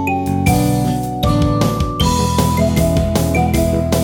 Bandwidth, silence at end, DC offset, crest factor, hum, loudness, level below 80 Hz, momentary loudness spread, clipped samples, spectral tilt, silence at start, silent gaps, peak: 18.5 kHz; 0 s; under 0.1%; 14 dB; none; -16 LUFS; -24 dBFS; 3 LU; under 0.1%; -6 dB/octave; 0 s; none; 0 dBFS